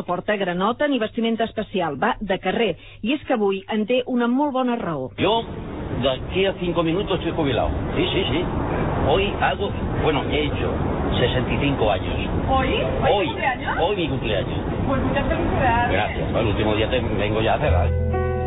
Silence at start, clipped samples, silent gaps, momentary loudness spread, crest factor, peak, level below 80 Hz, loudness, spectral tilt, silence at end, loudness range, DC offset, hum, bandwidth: 0 s; under 0.1%; none; 5 LU; 16 dB; -6 dBFS; -32 dBFS; -22 LUFS; -10 dB/octave; 0 s; 2 LU; 0.3%; none; 4 kHz